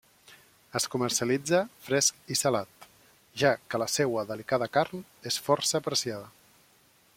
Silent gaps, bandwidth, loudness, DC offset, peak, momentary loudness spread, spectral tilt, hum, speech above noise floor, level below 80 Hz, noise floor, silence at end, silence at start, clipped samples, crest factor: none; 16.5 kHz; -28 LUFS; under 0.1%; -8 dBFS; 10 LU; -3 dB/octave; none; 34 dB; -70 dBFS; -63 dBFS; 0.85 s; 0.3 s; under 0.1%; 22 dB